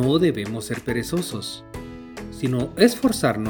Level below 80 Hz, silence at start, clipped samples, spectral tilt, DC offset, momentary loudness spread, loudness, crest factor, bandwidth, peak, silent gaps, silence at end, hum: -48 dBFS; 0 s; under 0.1%; -5.5 dB/octave; under 0.1%; 19 LU; -23 LUFS; 22 dB; 19.5 kHz; 0 dBFS; none; 0 s; none